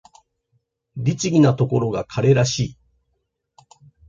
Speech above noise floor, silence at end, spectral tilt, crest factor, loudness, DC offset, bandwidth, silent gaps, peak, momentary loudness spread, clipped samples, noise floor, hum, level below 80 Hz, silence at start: 55 dB; 1.35 s; -6 dB/octave; 18 dB; -19 LUFS; under 0.1%; 7.8 kHz; none; -4 dBFS; 9 LU; under 0.1%; -73 dBFS; none; -52 dBFS; 0.95 s